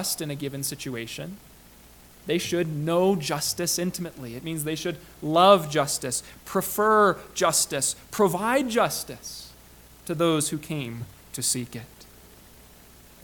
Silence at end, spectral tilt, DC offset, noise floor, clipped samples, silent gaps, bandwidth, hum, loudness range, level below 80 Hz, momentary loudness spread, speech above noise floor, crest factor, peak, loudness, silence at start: 1.2 s; -3.5 dB/octave; under 0.1%; -51 dBFS; under 0.1%; none; 19 kHz; none; 7 LU; -56 dBFS; 17 LU; 26 dB; 24 dB; -2 dBFS; -25 LUFS; 0 s